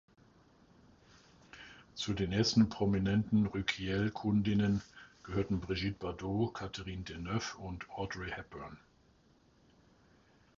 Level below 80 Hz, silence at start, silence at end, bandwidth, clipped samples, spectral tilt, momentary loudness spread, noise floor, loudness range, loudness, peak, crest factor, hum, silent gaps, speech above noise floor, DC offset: -54 dBFS; 1.55 s; 1.8 s; 7.6 kHz; under 0.1%; -6 dB/octave; 19 LU; -67 dBFS; 11 LU; -35 LUFS; -16 dBFS; 20 dB; none; none; 33 dB; under 0.1%